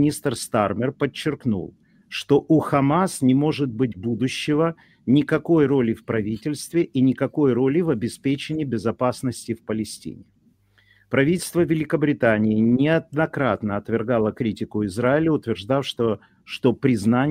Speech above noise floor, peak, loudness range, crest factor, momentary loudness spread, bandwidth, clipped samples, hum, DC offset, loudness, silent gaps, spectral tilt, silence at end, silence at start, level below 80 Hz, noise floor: 39 dB; -4 dBFS; 4 LU; 18 dB; 9 LU; 16 kHz; under 0.1%; none; under 0.1%; -22 LUFS; none; -6.5 dB/octave; 0 s; 0 s; -56 dBFS; -60 dBFS